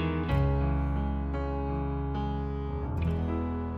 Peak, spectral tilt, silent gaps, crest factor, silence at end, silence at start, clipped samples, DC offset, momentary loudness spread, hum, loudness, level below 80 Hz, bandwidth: -16 dBFS; -9.5 dB/octave; none; 14 dB; 0 s; 0 s; under 0.1%; under 0.1%; 6 LU; none; -31 LUFS; -34 dBFS; 4.8 kHz